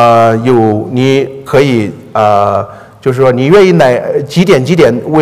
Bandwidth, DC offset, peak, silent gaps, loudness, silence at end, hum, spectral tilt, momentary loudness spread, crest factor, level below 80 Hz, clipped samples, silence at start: 15 kHz; 0.7%; 0 dBFS; none; -9 LUFS; 0 s; none; -7 dB/octave; 8 LU; 8 dB; -44 dBFS; 2%; 0 s